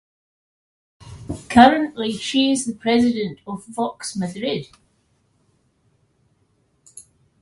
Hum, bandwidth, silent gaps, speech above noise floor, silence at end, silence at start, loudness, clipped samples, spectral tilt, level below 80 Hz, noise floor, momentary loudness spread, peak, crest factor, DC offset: none; 11.5 kHz; none; 45 dB; 0.4 s; 1.05 s; -19 LUFS; under 0.1%; -4.5 dB/octave; -50 dBFS; -64 dBFS; 19 LU; 0 dBFS; 22 dB; under 0.1%